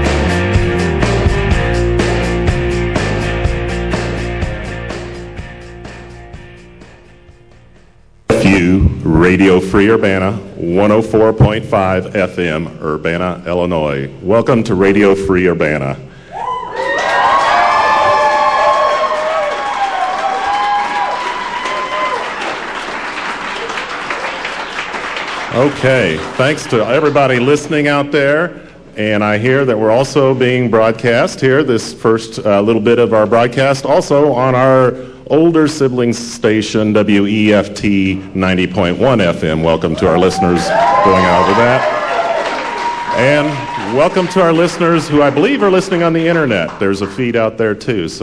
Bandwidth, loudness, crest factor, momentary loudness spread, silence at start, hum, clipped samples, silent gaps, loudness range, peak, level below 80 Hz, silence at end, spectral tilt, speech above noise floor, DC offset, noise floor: 11 kHz; -13 LUFS; 12 dB; 10 LU; 0 s; none; under 0.1%; none; 7 LU; -2 dBFS; -28 dBFS; 0 s; -6 dB/octave; 34 dB; 0.4%; -46 dBFS